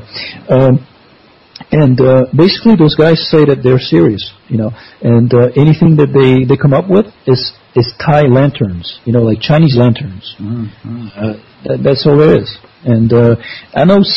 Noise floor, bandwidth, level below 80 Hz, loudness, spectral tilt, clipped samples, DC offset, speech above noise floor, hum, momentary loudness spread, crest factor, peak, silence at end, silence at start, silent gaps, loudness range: -44 dBFS; 5.8 kHz; -40 dBFS; -10 LUFS; -9.5 dB/octave; 0.3%; under 0.1%; 34 dB; none; 13 LU; 10 dB; 0 dBFS; 0 s; 0.15 s; none; 4 LU